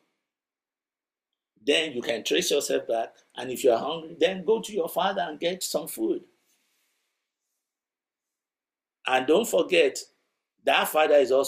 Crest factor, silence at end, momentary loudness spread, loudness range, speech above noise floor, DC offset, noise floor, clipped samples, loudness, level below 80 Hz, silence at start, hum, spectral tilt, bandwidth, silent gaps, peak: 20 dB; 0 s; 12 LU; 9 LU; over 65 dB; under 0.1%; under -90 dBFS; under 0.1%; -25 LUFS; -74 dBFS; 1.65 s; none; -2.5 dB/octave; 16 kHz; none; -8 dBFS